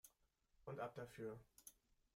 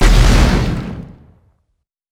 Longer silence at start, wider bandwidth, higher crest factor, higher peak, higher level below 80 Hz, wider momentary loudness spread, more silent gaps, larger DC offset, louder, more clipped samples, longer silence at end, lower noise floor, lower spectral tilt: about the same, 0.05 s vs 0 s; first, 16.5 kHz vs 14 kHz; first, 20 dB vs 14 dB; second, -36 dBFS vs 0 dBFS; second, -80 dBFS vs -16 dBFS; second, 13 LU vs 20 LU; neither; neither; second, -55 LUFS vs -14 LUFS; neither; second, 0.45 s vs 1.05 s; first, -82 dBFS vs -69 dBFS; about the same, -5.5 dB/octave vs -5.5 dB/octave